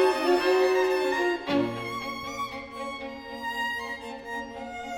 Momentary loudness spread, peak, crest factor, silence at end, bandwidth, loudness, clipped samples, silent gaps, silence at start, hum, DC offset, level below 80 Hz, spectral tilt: 14 LU; -12 dBFS; 16 dB; 0 s; 17 kHz; -28 LUFS; under 0.1%; none; 0 s; none; under 0.1%; -58 dBFS; -4.5 dB/octave